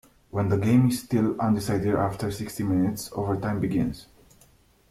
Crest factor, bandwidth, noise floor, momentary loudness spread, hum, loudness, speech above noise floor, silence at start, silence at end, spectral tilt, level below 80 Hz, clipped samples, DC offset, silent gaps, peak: 16 dB; 15.5 kHz; -59 dBFS; 10 LU; none; -25 LUFS; 34 dB; 0.35 s; 0.9 s; -7 dB/octave; -52 dBFS; under 0.1%; under 0.1%; none; -10 dBFS